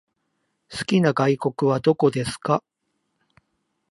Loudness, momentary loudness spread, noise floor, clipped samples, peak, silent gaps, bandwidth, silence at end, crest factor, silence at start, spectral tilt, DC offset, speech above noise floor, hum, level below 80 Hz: -22 LUFS; 7 LU; -75 dBFS; under 0.1%; -4 dBFS; none; 11.5 kHz; 1.3 s; 20 dB; 0.7 s; -6.5 dB/octave; under 0.1%; 54 dB; none; -60 dBFS